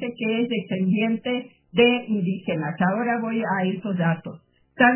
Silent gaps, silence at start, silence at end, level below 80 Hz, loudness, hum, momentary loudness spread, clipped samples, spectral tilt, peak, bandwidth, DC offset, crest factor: none; 0 s; 0 s; -64 dBFS; -23 LUFS; none; 8 LU; under 0.1%; -10.5 dB/octave; -4 dBFS; 3.2 kHz; under 0.1%; 20 dB